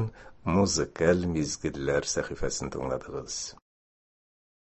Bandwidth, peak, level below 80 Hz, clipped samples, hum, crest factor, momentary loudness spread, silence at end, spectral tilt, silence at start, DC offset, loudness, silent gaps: 8.4 kHz; -8 dBFS; -46 dBFS; under 0.1%; none; 22 dB; 10 LU; 1.05 s; -4.5 dB/octave; 0 s; under 0.1%; -29 LUFS; none